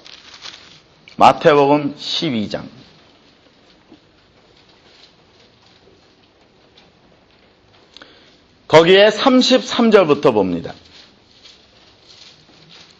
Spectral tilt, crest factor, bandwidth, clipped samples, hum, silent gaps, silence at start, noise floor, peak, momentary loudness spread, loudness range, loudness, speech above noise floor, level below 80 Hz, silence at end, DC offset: -5 dB/octave; 18 dB; 8.6 kHz; under 0.1%; none; none; 0.45 s; -52 dBFS; 0 dBFS; 24 LU; 13 LU; -13 LUFS; 39 dB; -56 dBFS; 2.3 s; under 0.1%